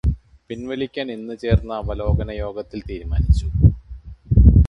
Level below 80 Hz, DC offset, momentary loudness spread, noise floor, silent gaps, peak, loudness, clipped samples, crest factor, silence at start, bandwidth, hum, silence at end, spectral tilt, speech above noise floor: -22 dBFS; under 0.1%; 17 LU; -38 dBFS; none; 0 dBFS; -21 LUFS; under 0.1%; 18 dB; 0.05 s; 7.6 kHz; none; 0 s; -9 dB/octave; 16 dB